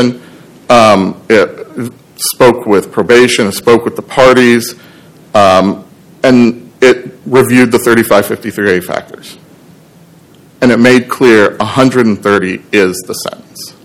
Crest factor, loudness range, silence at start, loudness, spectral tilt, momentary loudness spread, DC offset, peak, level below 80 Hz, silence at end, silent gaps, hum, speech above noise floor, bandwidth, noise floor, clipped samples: 10 dB; 3 LU; 0 s; -9 LUFS; -5 dB/octave; 14 LU; under 0.1%; 0 dBFS; -44 dBFS; 0.15 s; none; none; 32 dB; 17 kHz; -40 dBFS; 5%